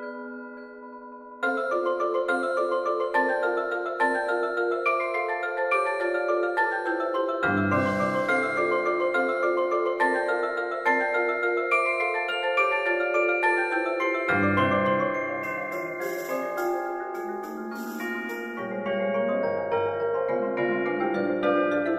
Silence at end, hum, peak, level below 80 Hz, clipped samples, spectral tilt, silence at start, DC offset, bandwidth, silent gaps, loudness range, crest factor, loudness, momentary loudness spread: 0 s; none; -10 dBFS; -66 dBFS; under 0.1%; -6 dB/octave; 0 s; under 0.1%; 14.5 kHz; none; 6 LU; 16 dB; -26 LUFS; 9 LU